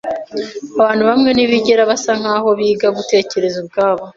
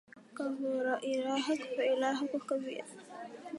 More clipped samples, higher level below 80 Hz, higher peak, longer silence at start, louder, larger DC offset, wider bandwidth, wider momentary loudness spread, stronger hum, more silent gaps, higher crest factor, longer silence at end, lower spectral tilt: neither; first, -54 dBFS vs -88 dBFS; first, 0 dBFS vs -18 dBFS; about the same, 0.05 s vs 0.15 s; first, -14 LUFS vs -35 LUFS; neither; second, 7.8 kHz vs 11.5 kHz; second, 11 LU vs 16 LU; neither; neither; about the same, 14 dB vs 16 dB; about the same, 0.05 s vs 0 s; about the same, -4 dB/octave vs -3.5 dB/octave